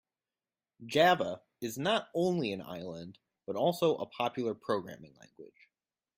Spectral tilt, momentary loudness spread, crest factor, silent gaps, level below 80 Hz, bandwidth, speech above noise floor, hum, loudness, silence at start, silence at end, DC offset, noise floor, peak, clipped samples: -5 dB/octave; 21 LU; 20 dB; none; -74 dBFS; 16 kHz; over 58 dB; none; -32 LUFS; 0.8 s; 0.7 s; under 0.1%; under -90 dBFS; -14 dBFS; under 0.1%